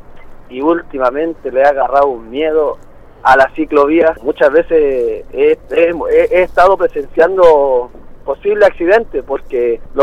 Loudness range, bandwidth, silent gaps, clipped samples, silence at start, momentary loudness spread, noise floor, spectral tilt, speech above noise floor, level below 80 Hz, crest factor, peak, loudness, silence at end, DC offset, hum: 2 LU; 9 kHz; none; under 0.1%; 0.1 s; 9 LU; -31 dBFS; -6 dB/octave; 20 dB; -36 dBFS; 12 dB; 0 dBFS; -12 LUFS; 0 s; under 0.1%; none